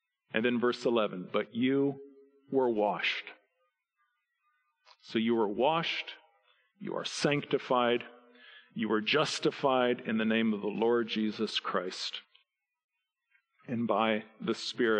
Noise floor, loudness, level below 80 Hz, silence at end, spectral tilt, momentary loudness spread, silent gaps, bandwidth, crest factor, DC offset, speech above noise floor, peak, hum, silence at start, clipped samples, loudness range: -79 dBFS; -31 LUFS; -80 dBFS; 0 s; -5 dB/octave; 9 LU; 12.84-12.89 s; 10 kHz; 20 dB; under 0.1%; 49 dB; -12 dBFS; none; 0.35 s; under 0.1%; 5 LU